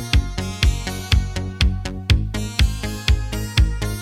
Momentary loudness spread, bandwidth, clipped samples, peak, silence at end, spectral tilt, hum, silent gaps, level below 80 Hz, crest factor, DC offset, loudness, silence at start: 5 LU; 16 kHz; under 0.1%; -2 dBFS; 0 s; -4.5 dB/octave; none; none; -22 dBFS; 16 dB; under 0.1%; -21 LUFS; 0 s